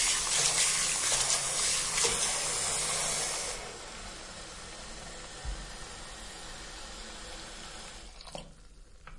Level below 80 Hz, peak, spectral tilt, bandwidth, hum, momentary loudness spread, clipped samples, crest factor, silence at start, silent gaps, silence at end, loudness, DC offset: -50 dBFS; -12 dBFS; 0 dB/octave; 11.5 kHz; none; 18 LU; under 0.1%; 22 dB; 0 s; none; 0 s; -27 LUFS; under 0.1%